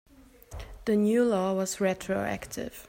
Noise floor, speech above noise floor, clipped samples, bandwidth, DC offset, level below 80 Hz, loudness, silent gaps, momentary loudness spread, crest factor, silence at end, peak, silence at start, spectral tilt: -48 dBFS; 20 dB; under 0.1%; 16 kHz; under 0.1%; -52 dBFS; -28 LUFS; none; 19 LU; 14 dB; 0 s; -14 dBFS; 0.5 s; -5.5 dB/octave